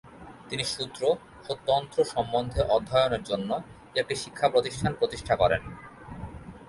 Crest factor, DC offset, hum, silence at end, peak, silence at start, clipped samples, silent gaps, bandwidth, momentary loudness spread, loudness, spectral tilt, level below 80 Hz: 20 dB; under 0.1%; none; 0 s; -8 dBFS; 0.05 s; under 0.1%; none; 11.5 kHz; 18 LU; -28 LUFS; -4.5 dB/octave; -48 dBFS